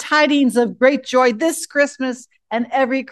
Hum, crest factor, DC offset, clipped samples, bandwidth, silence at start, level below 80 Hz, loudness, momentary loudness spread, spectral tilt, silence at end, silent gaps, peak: none; 16 dB; under 0.1%; under 0.1%; 12.5 kHz; 0 s; -70 dBFS; -17 LUFS; 10 LU; -3.5 dB/octave; 0.05 s; none; 0 dBFS